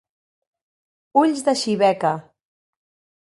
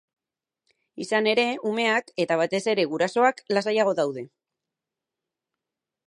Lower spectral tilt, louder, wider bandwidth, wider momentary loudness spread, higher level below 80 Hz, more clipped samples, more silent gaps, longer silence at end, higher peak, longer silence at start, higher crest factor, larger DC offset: about the same, -4.5 dB/octave vs -4 dB/octave; first, -20 LUFS vs -24 LUFS; about the same, 11.5 kHz vs 11.5 kHz; about the same, 6 LU vs 6 LU; first, -70 dBFS vs -80 dBFS; neither; neither; second, 1.1 s vs 1.8 s; about the same, -4 dBFS vs -6 dBFS; first, 1.15 s vs 0.95 s; about the same, 20 dB vs 20 dB; neither